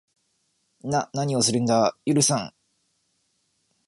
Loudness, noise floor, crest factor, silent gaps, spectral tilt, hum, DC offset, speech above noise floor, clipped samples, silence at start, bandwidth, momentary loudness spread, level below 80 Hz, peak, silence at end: -23 LUFS; -71 dBFS; 20 dB; none; -4 dB/octave; none; under 0.1%; 49 dB; under 0.1%; 0.85 s; 12 kHz; 9 LU; -64 dBFS; -6 dBFS; 1.4 s